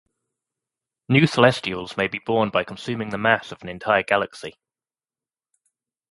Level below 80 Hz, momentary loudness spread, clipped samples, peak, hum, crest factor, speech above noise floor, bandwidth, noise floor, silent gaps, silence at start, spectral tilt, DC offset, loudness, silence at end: -58 dBFS; 13 LU; under 0.1%; 0 dBFS; none; 24 dB; over 68 dB; 11.5 kHz; under -90 dBFS; none; 1.1 s; -6 dB/octave; under 0.1%; -21 LUFS; 1.6 s